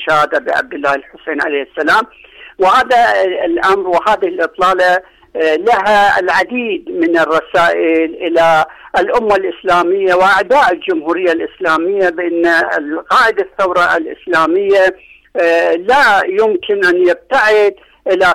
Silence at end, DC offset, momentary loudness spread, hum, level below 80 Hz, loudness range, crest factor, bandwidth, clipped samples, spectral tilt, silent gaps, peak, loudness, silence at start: 0 s; under 0.1%; 7 LU; none; -48 dBFS; 1 LU; 8 dB; 15 kHz; under 0.1%; -4 dB/octave; none; -4 dBFS; -12 LUFS; 0 s